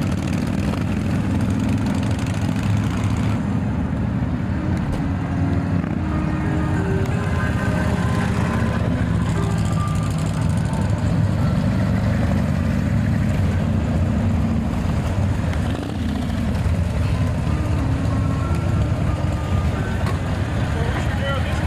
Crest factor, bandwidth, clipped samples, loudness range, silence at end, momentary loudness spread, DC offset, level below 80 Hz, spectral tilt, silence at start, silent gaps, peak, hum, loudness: 12 dB; 13.5 kHz; under 0.1%; 2 LU; 0 s; 3 LU; under 0.1%; -30 dBFS; -7.5 dB/octave; 0 s; none; -8 dBFS; none; -21 LUFS